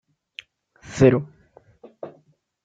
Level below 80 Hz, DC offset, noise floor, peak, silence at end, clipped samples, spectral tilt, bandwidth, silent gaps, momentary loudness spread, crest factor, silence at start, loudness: -50 dBFS; under 0.1%; -60 dBFS; -2 dBFS; 0.55 s; under 0.1%; -7.5 dB/octave; 7.8 kHz; none; 24 LU; 22 dB; 0.9 s; -19 LUFS